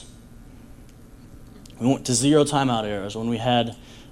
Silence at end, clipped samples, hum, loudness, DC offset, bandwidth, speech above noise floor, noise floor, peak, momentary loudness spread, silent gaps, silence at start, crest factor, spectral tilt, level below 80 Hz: 0 s; under 0.1%; none; -22 LUFS; under 0.1%; 16 kHz; 23 dB; -45 dBFS; -6 dBFS; 10 LU; none; 0 s; 20 dB; -4.5 dB/octave; -48 dBFS